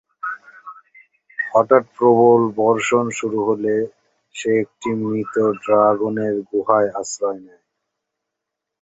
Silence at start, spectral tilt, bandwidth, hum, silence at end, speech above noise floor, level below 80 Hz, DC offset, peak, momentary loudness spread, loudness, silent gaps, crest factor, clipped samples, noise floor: 0.25 s; -5.5 dB/octave; 8.2 kHz; none; 1.4 s; 64 dB; -64 dBFS; under 0.1%; 0 dBFS; 15 LU; -18 LUFS; none; 18 dB; under 0.1%; -82 dBFS